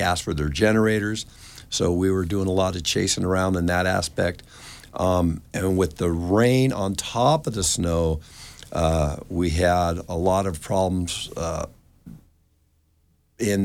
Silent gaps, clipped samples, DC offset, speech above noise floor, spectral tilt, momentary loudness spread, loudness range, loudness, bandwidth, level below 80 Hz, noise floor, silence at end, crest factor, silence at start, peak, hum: none; under 0.1%; under 0.1%; 41 dB; -5 dB/octave; 12 LU; 3 LU; -23 LUFS; 16.5 kHz; -38 dBFS; -64 dBFS; 0 s; 18 dB; 0 s; -6 dBFS; none